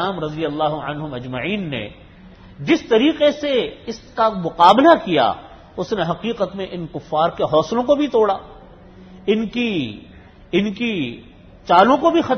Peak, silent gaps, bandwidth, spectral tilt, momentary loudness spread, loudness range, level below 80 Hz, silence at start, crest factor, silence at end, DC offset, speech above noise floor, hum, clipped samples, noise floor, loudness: 0 dBFS; none; 8 kHz; -6 dB/octave; 16 LU; 5 LU; -48 dBFS; 0 s; 18 dB; 0 s; under 0.1%; 25 dB; none; under 0.1%; -43 dBFS; -18 LUFS